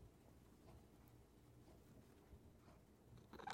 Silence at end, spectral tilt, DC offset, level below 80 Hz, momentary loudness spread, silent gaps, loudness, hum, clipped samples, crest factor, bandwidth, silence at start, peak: 0 s; -5 dB/octave; under 0.1%; -72 dBFS; 4 LU; none; -66 LUFS; none; under 0.1%; 32 dB; 16.5 kHz; 0 s; -30 dBFS